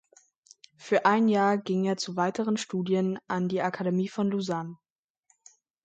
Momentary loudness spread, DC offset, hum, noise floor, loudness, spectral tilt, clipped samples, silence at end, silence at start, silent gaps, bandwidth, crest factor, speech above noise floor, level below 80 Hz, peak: 8 LU; under 0.1%; none; -71 dBFS; -27 LUFS; -6 dB/octave; under 0.1%; 1.1 s; 0.8 s; none; 9 kHz; 20 dB; 44 dB; -74 dBFS; -8 dBFS